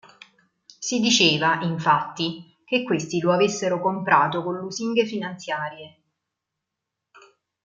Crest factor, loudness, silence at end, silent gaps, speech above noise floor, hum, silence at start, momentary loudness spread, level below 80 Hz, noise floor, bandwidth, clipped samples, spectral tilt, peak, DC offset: 22 dB; -22 LUFS; 1.75 s; none; 61 dB; none; 0.8 s; 12 LU; -70 dBFS; -84 dBFS; 9.4 kHz; under 0.1%; -3.5 dB/octave; -2 dBFS; under 0.1%